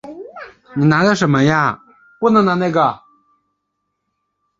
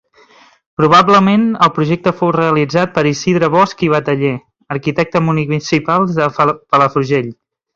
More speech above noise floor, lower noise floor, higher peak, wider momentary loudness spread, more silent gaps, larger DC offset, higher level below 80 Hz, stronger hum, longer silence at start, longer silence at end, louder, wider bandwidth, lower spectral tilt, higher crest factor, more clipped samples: first, 60 dB vs 34 dB; first, -73 dBFS vs -46 dBFS; about the same, 0 dBFS vs 0 dBFS; first, 20 LU vs 8 LU; neither; neither; about the same, -54 dBFS vs -50 dBFS; neither; second, 0.05 s vs 0.8 s; first, 1.65 s vs 0.4 s; about the same, -15 LUFS vs -13 LUFS; about the same, 7.8 kHz vs 7.8 kHz; about the same, -6.5 dB/octave vs -6.5 dB/octave; about the same, 18 dB vs 14 dB; neither